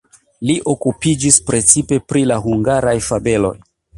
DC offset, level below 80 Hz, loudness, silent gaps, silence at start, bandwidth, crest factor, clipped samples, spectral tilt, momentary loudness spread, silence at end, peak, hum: under 0.1%; -40 dBFS; -14 LUFS; none; 0.4 s; 15 kHz; 16 dB; under 0.1%; -4.5 dB/octave; 8 LU; 0.4 s; 0 dBFS; none